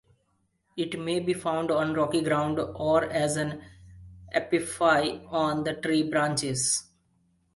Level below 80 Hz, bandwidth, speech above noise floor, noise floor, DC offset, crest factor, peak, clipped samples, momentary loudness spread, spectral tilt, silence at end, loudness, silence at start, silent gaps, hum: -58 dBFS; 11.5 kHz; 46 dB; -72 dBFS; under 0.1%; 20 dB; -8 dBFS; under 0.1%; 7 LU; -4 dB/octave; 0.75 s; -27 LUFS; 0.75 s; none; none